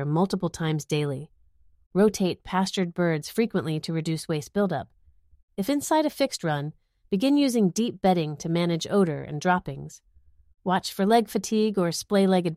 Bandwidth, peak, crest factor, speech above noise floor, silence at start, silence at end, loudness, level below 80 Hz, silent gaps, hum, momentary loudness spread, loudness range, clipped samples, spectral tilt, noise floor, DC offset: 15.5 kHz; -8 dBFS; 18 dB; 34 dB; 0 s; 0 s; -25 LUFS; -58 dBFS; 1.86-1.91 s, 5.43-5.48 s; none; 9 LU; 3 LU; under 0.1%; -5.5 dB/octave; -58 dBFS; under 0.1%